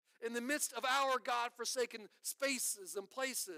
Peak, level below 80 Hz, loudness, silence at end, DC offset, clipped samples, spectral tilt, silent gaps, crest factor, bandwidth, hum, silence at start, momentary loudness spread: -22 dBFS; under -90 dBFS; -38 LUFS; 0 s; under 0.1%; under 0.1%; 0 dB/octave; none; 18 dB; 16 kHz; none; 0.2 s; 9 LU